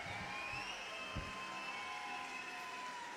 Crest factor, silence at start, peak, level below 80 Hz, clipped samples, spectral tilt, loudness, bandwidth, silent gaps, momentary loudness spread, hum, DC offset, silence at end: 14 dB; 0 s; -30 dBFS; -64 dBFS; under 0.1%; -2.5 dB/octave; -44 LUFS; 16 kHz; none; 3 LU; none; under 0.1%; 0 s